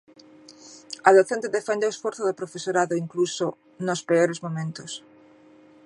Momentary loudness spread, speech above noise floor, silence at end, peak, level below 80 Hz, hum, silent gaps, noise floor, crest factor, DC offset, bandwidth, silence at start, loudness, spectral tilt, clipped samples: 17 LU; 29 dB; 0.85 s; -2 dBFS; -76 dBFS; none; none; -52 dBFS; 24 dB; under 0.1%; 11 kHz; 0.5 s; -24 LUFS; -4.5 dB/octave; under 0.1%